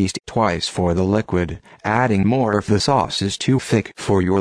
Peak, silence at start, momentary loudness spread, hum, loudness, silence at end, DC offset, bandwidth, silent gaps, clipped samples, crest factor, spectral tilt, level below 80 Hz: -4 dBFS; 0 s; 5 LU; none; -19 LUFS; 0 s; under 0.1%; 11 kHz; none; under 0.1%; 16 dB; -5.5 dB/octave; -42 dBFS